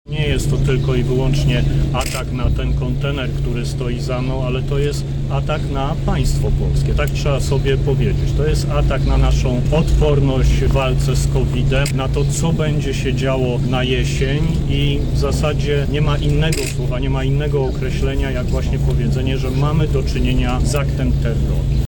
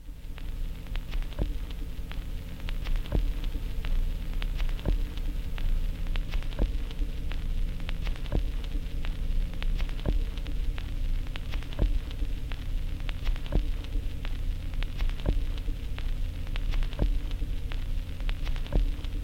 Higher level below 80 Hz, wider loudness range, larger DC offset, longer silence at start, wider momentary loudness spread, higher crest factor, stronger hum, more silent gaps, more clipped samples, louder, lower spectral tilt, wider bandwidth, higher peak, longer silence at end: first, -20 dBFS vs -30 dBFS; first, 4 LU vs 1 LU; neither; about the same, 0.05 s vs 0 s; about the same, 4 LU vs 6 LU; second, 10 dB vs 18 dB; neither; neither; neither; first, -18 LUFS vs -35 LUFS; about the same, -6.5 dB/octave vs -6 dB/octave; first, 18 kHz vs 15 kHz; first, -6 dBFS vs -10 dBFS; about the same, 0 s vs 0 s